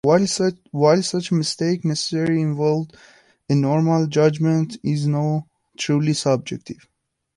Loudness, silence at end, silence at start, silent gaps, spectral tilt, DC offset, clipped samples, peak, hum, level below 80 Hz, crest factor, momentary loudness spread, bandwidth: -20 LUFS; 0.65 s; 0.05 s; none; -6 dB/octave; under 0.1%; under 0.1%; -4 dBFS; none; -60 dBFS; 18 dB; 9 LU; 11.5 kHz